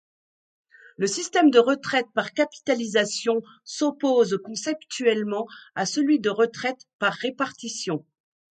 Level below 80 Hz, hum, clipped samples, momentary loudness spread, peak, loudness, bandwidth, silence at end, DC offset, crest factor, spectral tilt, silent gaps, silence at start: -74 dBFS; none; under 0.1%; 10 LU; -4 dBFS; -24 LUFS; 9.4 kHz; 0.55 s; under 0.1%; 20 dB; -3.5 dB/octave; 6.93-6.99 s; 1 s